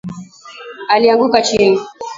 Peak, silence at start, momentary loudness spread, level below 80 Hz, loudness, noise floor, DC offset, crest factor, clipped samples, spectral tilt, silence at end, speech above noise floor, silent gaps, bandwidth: 0 dBFS; 0.05 s; 21 LU; -50 dBFS; -13 LUFS; -35 dBFS; under 0.1%; 14 dB; under 0.1%; -4 dB/octave; 0 s; 23 dB; none; 7.8 kHz